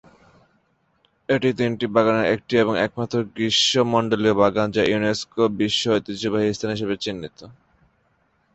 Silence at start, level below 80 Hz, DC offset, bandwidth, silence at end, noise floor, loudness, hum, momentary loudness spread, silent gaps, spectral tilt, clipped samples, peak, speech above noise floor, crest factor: 1.3 s; -54 dBFS; under 0.1%; 8.2 kHz; 1 s; -65 dBFS; -21 LUFS; none; 8 LU; none; -4.5 dB/octave; under 0.1%; -2 dBFS; 44 dB; 20 dB